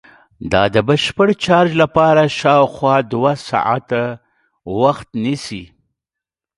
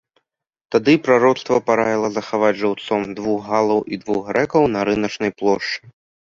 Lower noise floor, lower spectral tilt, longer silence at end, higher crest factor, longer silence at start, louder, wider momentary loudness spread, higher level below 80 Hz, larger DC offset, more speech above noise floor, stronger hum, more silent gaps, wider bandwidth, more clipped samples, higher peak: first, -86 dBFS vs -68 dBFS; about the same, -6 dB/octave vs -5.5 dB/octave; first, 0.95 s vs 0.55 s; about the same, 16 dB vs 18 dB; second, 0.4 s vs 0.7 s; first, -15 LUFS vs -19 LUFS; first, 12 LU vs 8 LU; first, -46 dBFS vs -56 dBFS; neither; first, 71 dB vs 50 dB; neither; neither; first, 11.5 kHz vs 7.6 kHz; neither; about the same, 0 dBFS vs -2 dBFS